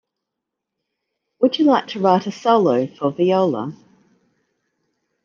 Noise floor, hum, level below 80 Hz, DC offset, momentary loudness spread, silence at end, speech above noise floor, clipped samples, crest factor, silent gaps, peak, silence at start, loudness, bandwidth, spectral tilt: -81 dBFS; none; -72 dBFS; under 0.1%; 7 LU; 1.5 s; 64 dB; under 0.1%; 18 dB; none; -2 dBFS; 1.4 s; -18 LUFS; 7.2 kHz; -7 dB/octave